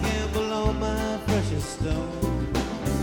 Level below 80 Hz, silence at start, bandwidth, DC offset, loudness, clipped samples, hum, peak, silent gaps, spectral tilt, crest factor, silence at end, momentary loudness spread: -34 dBFS; 0 s; 19 kHz; under 0.1%; -27 LUFS; under 0.1%; none; -10 dBFS; none; -5.5 dB/octave; 16 dB; 0 s; 3 LU